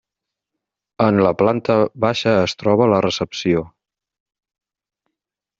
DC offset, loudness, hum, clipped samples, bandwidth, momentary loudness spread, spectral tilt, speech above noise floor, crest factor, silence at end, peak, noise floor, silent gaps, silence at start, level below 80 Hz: under 0.1%; -17 LUFS; none; under 0.1%; 7.8 kHz; 5 LU; -6 dB/octave; 67 dB; 18 dB; 1.9 s; -2 dBFS; -84 dBFS; none; 1 s; -56 dBFS